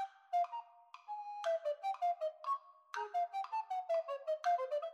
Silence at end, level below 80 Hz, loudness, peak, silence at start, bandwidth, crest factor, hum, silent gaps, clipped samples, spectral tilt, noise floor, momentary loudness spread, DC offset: 0 s; under -90 dBFS; -39 LUFS; -26 dBFS; 0 s; 9 kHz; 14 dB; none; none; under 0.1%; 1.5 dB/octave; -57 dBFS; 11 LU; under 0.1%